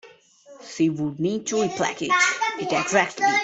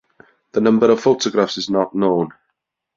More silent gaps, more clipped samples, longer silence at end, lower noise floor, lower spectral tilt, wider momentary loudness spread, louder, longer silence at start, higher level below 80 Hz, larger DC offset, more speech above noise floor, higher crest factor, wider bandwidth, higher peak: neither; neither; second, 0 s vs 0.7 s; second, -50 dBFS vs -75 dBFS; second, -3.5 dB/octave vs -5.5 dB/octave; about the same, 6 LU vs 8 LU; second, -22 LUFS vs -17 LUFS; second, 0.05 s vs 0.55 s; second, -66 dBFS vs -58 dBFS; neither; second, 27 dB vs 59 dB; about the same, 20 dB vs 16 dB; first, 8.4 kHz vs 7.6 kHz; about the same, -4 dBFS vs -2 dBFS